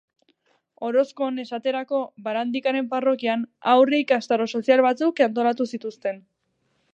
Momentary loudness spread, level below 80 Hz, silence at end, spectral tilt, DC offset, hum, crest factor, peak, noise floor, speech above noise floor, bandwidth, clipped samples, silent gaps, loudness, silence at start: 11 LU; -82 dBFS; 0.75 s; -5 dB/octave; under 0.1%; none; 18 dB; -4 dBFS; -71 dBFS; 49 dB; 8 kHz; under 0.1%; none; -23 LUFS; 0.8 s